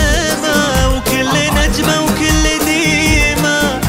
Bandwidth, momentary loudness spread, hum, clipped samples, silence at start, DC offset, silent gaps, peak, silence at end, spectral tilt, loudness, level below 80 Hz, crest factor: 16.5 kHz; 3 LU; none; under 0.1%; 0 s; under 0.1%; none; 0 dBFS; 0 s; -3.5 dB/octave; -12 LUFS; -20 dBFS; 12 dB